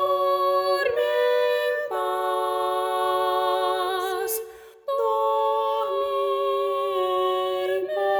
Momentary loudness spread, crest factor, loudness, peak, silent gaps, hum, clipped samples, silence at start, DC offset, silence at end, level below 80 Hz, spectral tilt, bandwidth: 4 LU; 12 dB; -24 LUFS; -12 dBFS; none; none; under 0.1%; 0 s; under 0.1%; 0 s; -68 dBFS; -2 dB/octave; over 20 kHz